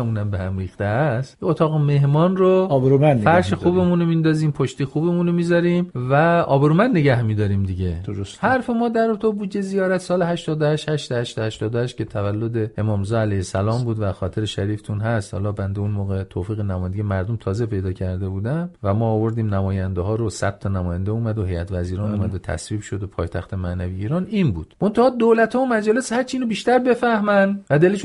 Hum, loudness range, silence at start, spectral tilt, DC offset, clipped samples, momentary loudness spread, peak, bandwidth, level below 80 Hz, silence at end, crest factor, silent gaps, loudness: none; 7 LU; 0 s; -7.5 dB/octave; under 0.1%; under 0.1%; 9 LU; -2 dBFS; 11.5 kHz; -46 dBFS; 0 s; 18 dB; none; -20 LUFS